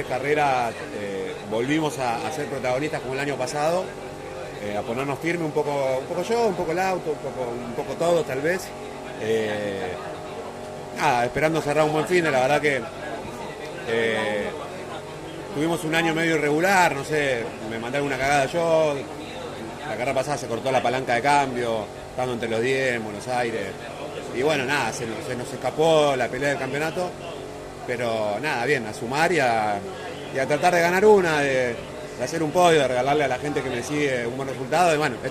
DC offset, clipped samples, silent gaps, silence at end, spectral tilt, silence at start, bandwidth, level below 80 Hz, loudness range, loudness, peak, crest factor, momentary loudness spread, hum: under 0.1%; under 0.1%; none; 0 s; -4.5 dB/octave; 0 s; 14.5 kHz; -54 dBFS; 5 LU; -24 LUFS; -6 dBFS; 18 dB; 14 LU; none